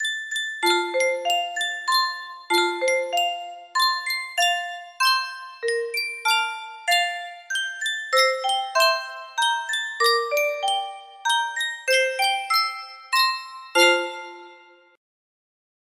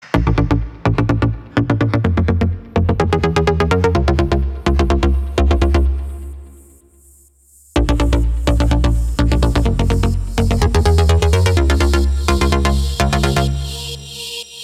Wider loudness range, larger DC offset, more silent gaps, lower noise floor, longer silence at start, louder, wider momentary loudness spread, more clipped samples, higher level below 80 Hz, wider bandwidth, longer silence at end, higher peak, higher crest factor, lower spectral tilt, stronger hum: about the same, 2 LU vs 4 LU; neither; neither; about the same, -50 dBFS vs -49 dBFS; about the same, 0 s vs 0.05 s; second, -22 LUFS vs -16 LUFS; about the same, 10 LU vs 8 LU; neither; second, -78 dBFS vs -18 dBFS; first, 16 kHz vs 14 kHz; first, 1.35 s vs 0 s; second, -4 dBFS vs 0 dBFS; first, 20 dB vs 14 dB; second, 1 dB/octave vs -6.5 dB/octave; neither